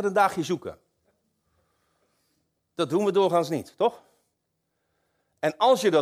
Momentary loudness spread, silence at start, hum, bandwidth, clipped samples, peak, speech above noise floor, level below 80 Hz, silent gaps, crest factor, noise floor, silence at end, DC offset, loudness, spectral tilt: 10 LU; 0 s; none; 16 kHz; under 0.1%; -8 dBFS; 55 dB; -72 dBFS; none; 18 dB; -78 dBFS; 0 s; under 0.1%; -25 LUFS; -5 dB/octave